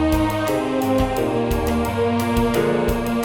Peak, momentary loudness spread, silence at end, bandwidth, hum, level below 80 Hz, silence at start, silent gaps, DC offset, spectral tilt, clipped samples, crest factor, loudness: -8 dBFS; 2 LU; 0 s; 17.5 kHz; none; -30 dBFS; 0 s; none; 0.2%; -6 dB/octave; under 0.1%; 12 dB; -20 LUFS